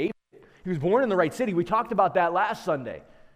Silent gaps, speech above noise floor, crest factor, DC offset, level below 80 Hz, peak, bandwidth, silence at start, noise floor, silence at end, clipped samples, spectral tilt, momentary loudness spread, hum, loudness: none; 31 dB; 16 dB; under 0.1%; -60 dBFS; -8 dBFS; 15.5 kHz; 0 s; -55 dBFS; 0.35 s; under 0.1%; -6.5 dB/octave; 17 LU; none; -25 LUFS